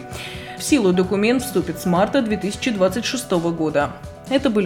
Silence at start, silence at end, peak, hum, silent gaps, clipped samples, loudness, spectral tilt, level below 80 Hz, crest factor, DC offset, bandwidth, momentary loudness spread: 0 s; 0 s; -4 dBFS; none; none; under 0.1%; -20 LUFS; -5 dB/octave; -46 dBFS; 16 dB; under 0.1%; 18 kHz; 9 LU